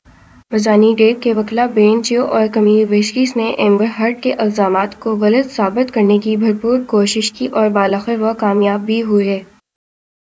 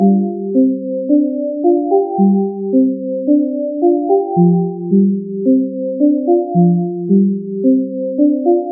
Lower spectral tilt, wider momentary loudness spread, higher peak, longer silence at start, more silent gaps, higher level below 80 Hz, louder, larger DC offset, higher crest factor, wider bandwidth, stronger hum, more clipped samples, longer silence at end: second, -5.5 dB/octave vs -19 dB/octave; about the same, 5 LU vs 4 LU; about the same, 0 dBFS vs -2 dBFS; first, 0.5 s vs 0 s; neither; first, -56 dBFS vs -74 dBFS; about the same, -14 LUFS vs -14 LUFS; neither; about the same, 14 dB vs 12 dB; first, 8 kHz vs 0.9 kHz; neither; neither; first, 0.95 s vs 0 s